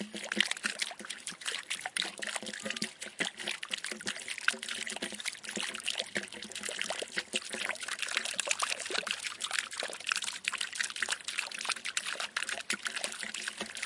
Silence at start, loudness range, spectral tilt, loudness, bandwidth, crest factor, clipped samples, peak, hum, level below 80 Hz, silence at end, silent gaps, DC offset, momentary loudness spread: 0 s; 2 LU; 0 dB/octave; -35 LUFS; 11.5 kHz; 30 dB; under 0.1%; -6 dBFS; none; -80 dBFS; 0 s; none; under 0.1%; 6 LU